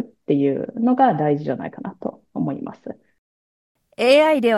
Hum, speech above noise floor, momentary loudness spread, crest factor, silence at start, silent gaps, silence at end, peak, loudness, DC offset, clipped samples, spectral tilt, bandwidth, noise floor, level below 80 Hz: none; over 71 dB; 18 LU; 16 dB; 0 s; 3.18-3.75 s; 0 s; -4 dBFS; -20 LUFS; under 0.1%; under 0.1%; -6.5 dB/octave; 12.5 kHz; under -90 dBFS; -68 dBFS